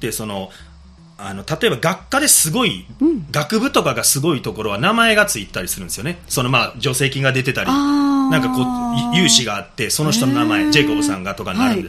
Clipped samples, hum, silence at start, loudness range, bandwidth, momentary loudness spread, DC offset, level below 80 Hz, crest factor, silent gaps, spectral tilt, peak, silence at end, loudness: under 0.1%; none; 0 s; 2 LU; 15.5 kHz; 11 LU; under 0.1%; -44 dBFS; 18 dB; none; -3.5 dB/octave; 0 dBFS; 0 s; -16 LUFS